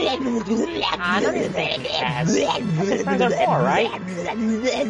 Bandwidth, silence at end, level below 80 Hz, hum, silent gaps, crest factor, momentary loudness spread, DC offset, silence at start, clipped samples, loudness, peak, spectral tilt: 10.5 kHz; 0 s; -52 dBFS; none; none; 16 dB; 5 LU; under 0.1%; 0 s; under 0.1%; -21 LUFS; -6 dBFS; -5 dB/octave